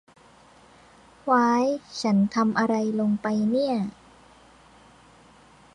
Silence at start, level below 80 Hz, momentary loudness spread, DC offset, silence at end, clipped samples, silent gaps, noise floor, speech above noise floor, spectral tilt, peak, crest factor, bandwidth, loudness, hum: 1.25 s; -64 dBFS; 7 LU; under 0.1%; 1.85 s; under 0.1%; none; -54 dBFS; 31 dB; -6.5 dB/octave; -10 dBFS; 16 dB; 10.5 kHz; -24 LUFS; none